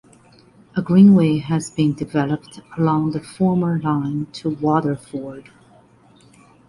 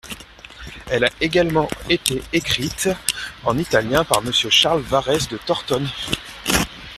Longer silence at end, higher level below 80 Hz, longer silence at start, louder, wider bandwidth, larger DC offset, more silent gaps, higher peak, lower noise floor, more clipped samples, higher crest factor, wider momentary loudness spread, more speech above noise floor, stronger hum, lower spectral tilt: first, 1.3 s vs 0 s; second, -54 dBFS vs -42 dBFS; first, 0.75 s vs 0.05 s; about the same, -19 LUFS vs -19 LUFS; second, 11.5 kHz vs 15.5 kHz; neither; neither; about the same, -2 dBFS vs 0 dBFS; first, -51 dBFS vs -40 dBFS; neither; about the same, 16 dB vs 20 dB; first, 16 LU vs 10 LU; first, 33 dB vs 20 dB; neither; first, -8 dB/octave vs -3 dB/octave